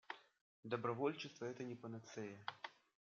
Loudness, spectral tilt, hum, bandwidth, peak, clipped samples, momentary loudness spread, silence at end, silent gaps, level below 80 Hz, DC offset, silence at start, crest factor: -47 LUFS; -4.5 dB/octave; none; 7.6 kHz; -26 dBFS; under 0.1%; 14 LU; 0.4 s; 0.41-0.63 s; under -90 dBFS; under 0.1%; 0.1 s; 22 dB